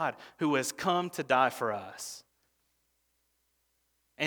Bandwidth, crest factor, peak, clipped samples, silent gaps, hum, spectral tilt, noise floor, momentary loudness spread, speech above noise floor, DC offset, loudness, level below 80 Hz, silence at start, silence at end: over 20 kHz; 22 dB; -10 dBFS; under 0.1%; none; 60 Hz at -70 dBFS; -4 dB/octave; -76 dBFS; 15 LU; 45 dB; under 0.1%; -30 LUFS; -78 dBFS; 0 s; 0 s